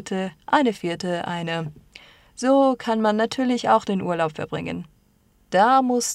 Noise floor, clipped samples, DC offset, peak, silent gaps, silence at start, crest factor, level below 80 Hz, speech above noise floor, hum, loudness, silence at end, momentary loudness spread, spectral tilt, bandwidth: -60 dBFS; under 0.1%; under 0.1%; -4 dBFS; none; 0 s; 18 dB; -60 dBFS; 39 dB; none; -22 LUFS; 0 s; 12 LU; -4.5 dB/octave; 14 kHz